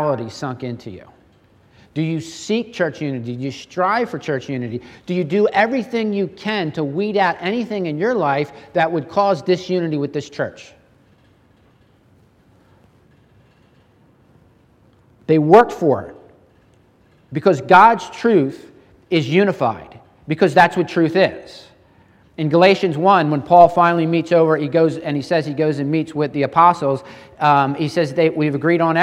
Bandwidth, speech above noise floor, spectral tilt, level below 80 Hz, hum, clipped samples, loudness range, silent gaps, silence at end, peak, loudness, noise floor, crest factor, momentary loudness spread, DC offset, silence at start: 11.5 kHz; 37 dB; -6.5 dB/octave; -60 dBFS; none; under 0.1%; 8 LU; none; 0 s; 0 dBFS; -17 LUFS; -54 dBFS; 18 dB; 14 LU; under 0.1%; 0 s